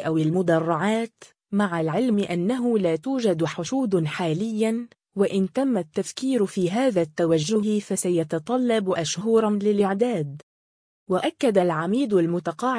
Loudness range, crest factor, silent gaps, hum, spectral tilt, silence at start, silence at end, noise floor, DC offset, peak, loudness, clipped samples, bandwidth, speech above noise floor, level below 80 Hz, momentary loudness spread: 2 LU; 16 dB; 10.43-11.06 s; none; -6 dB/octave; 0 s; 0 s; under -90 dBFS; under 0.1%; -6 dBFS; -23 LUFS; under 0.1%; 10.5 kHz; over 67 dB; -66 dBFS; 5 LU